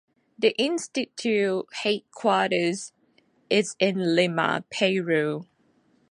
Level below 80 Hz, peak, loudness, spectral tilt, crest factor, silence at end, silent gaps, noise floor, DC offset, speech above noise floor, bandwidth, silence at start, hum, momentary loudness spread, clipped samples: -74 dBFS; -6 dBFS; -25 LUFS; -4.5 dB/octave; 20 dB; 0.65 s; none; -64 dBFS; under 0.1%; 40 dB; 11.5 kHz; 0.4 s; none; 6 LU; under 0.1%